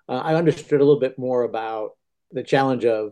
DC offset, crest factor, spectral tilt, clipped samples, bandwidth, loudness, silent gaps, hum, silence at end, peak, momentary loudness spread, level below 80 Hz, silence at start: under 0.1%; 16 dB; -7 dB/octave; under 0.1%; 9.4 kHz; -21 LUFS; none; none; 0 s; -6 dBFS; 14 LU; -66 dBFS; 0.1 s